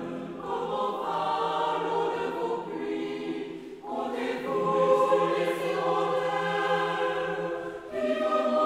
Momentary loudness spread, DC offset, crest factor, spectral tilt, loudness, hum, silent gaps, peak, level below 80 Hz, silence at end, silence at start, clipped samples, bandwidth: 10 LU; under 0.1%; 16 dB; -5.5 dB/octave; -28 LUFS; none; none; -12 dBFS; -68 dBFS; 0 s; 0 s; under 0.1%; 15.5 kHz